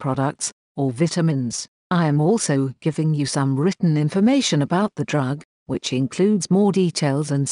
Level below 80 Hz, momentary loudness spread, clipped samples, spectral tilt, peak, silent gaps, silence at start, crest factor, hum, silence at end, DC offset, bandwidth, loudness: -62 dBFS; 9 LU; under 0.1%; -5.5 dB/octave; -8 dBFS; 0.53-0.75 s, 1.68-1.90 s, 5.45-5.66 s; 0 s; 12 dB; none; 0 s; under 0.1%; 11 kHz; -21 LUFS